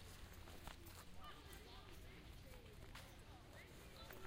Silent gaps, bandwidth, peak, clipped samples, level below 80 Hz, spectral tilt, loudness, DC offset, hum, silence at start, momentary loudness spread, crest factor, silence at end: none; 16 kHz; -40 dBFS; under 0.1%; -62 dBFS; -4 dB/octave; -59 LUFS; under 0.1%; none; 0 s; 3 LU; 18 dB; 0 s